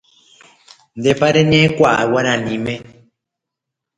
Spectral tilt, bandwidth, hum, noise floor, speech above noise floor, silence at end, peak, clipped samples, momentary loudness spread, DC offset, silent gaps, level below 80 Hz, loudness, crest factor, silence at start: -5.5 dB/octave; 9.6 kHz; none; -82 dBFS; 67 dB; 1.1 s; 0 dBFS; under 0.1%; 11 LU; under 0.1%; none; -50 dBFS; -15 LUFS; 18 dB; 0.95 s